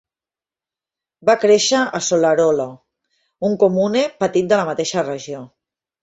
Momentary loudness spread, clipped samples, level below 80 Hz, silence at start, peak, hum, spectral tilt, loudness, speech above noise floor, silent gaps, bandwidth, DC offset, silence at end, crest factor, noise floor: 12 LU; under 0.1%; -62 dBFS; 1.25 s; -2 dBFS; none; -4 dB/octave; -17 LUFS; over 73 dB; none; 8 kHz; under 0.1%; 0.55 s; 16 dB; under -90 dBFS